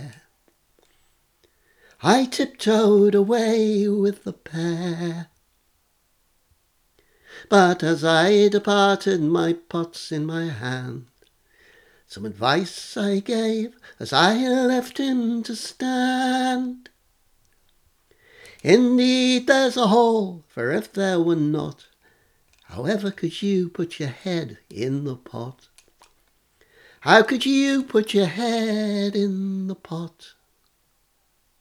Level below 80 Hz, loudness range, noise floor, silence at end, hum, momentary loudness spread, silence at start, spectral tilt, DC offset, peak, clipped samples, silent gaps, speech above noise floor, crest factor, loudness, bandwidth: -66 dBFS; 8 LU; -66 dBFS; 1.35 s; none; 16 LU; 0 s; -5 dB/octave; under 0.1%; 0 dBFS; under 0.1%; none; 45 dB; 22 dB; -21 LUFS; 15 kHz